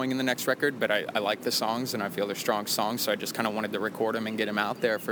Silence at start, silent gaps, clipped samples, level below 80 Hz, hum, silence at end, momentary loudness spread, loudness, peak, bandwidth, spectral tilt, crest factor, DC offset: 0 s; none; under 0.1%; -78 dBFS; none; 0 s; 3 LU; -28 LUFS; -10 dBFS; over 20 kHz; -3.5 dB/octave; 18 dB; under 0.1%